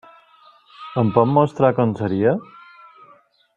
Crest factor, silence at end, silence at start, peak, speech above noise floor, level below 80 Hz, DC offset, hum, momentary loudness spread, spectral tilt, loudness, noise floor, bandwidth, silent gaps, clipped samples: 20 dB; 1.15 s; 0.8 s; 0 dBFS; 36 dB; -60 dBFS; under 0.1%; none; 11 LU; -9.5 dB/octave; -19 LUFS; -53 dBFS; 7.8 kHz; none; under 0.1%